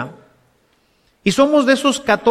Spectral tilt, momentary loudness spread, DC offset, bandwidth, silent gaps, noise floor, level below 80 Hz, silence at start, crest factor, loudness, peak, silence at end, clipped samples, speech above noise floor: -4 dB/octave; 9 LU; under 0.1%; 14.5 kHz; none; -60 dBFS; -54 dBFS; 0 s; 16 dB; -15 LUFS; 0 dBFS; 0 s; under 0.1%; 45 dB